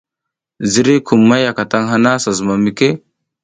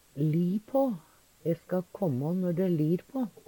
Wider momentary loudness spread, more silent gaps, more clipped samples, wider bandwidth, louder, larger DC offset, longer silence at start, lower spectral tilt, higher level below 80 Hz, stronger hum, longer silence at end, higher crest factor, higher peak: about the same, 6 LU vs 7 LU; neither; neither; second, 9.6 kHz vs 18 kHz; first, -13 LUFS vs -30 LUFS; neither; first, 0.6 s vs 0.15 s; second, -5 dB/octave vs -9.5 dB/octave; first, -52 dBFS vs -68 dBFS; neither; first, 0.45 s vs 0.15 s; about the same, 14 dB vs 14 dB; first, 0 dBFS vs -16 dBFS